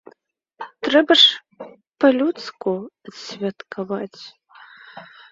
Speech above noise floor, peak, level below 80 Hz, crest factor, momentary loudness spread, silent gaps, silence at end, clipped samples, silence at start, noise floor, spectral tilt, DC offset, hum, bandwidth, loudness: 40 dB; 0 dBFS; -68 dBFS; 22 dB; 25 LU; none; 0.25 s; under 0.1%; 0.6 s; -60 dBFS; -4 dB/octave; under 0.1%; none; 7.8 kHz; -18 LUFS